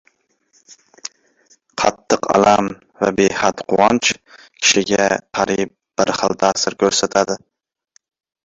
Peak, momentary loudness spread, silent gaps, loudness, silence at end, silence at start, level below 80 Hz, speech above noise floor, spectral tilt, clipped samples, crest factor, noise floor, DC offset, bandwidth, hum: 0 dBFS; 14 LU; none; -17 LUFS; 1.1 s; 1.05 s; -52 dBFS; 44 dB; -3 dB/octave; under 0.1%; 18 dB; -61 dBFS; under 0.1%; 8 kHz; none